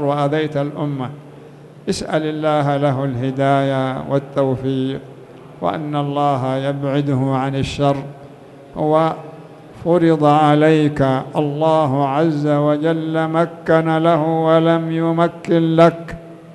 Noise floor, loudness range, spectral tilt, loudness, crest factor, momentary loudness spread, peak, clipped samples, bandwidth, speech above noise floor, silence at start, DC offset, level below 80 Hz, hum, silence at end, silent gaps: -39 dBFS; 5 LU; -7.5 dB/octave; -17 LUFS; 16 dB; 11 LU; -2 dBFS; under 0.1%; 11.5 kHz; 23 dB; 0 s; under 0.1%; -50 dBFS; none; 0 s; none